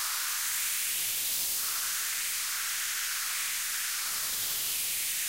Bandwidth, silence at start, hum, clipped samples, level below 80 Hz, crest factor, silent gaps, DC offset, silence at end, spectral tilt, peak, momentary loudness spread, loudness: 16 kHz; 0 s; none; under 0.1%; -68 dBFS; 14 dB; none; under 0.1%; 0 s; 3 dB/octave; -18 dBFS; 2 LU; -29 LUFS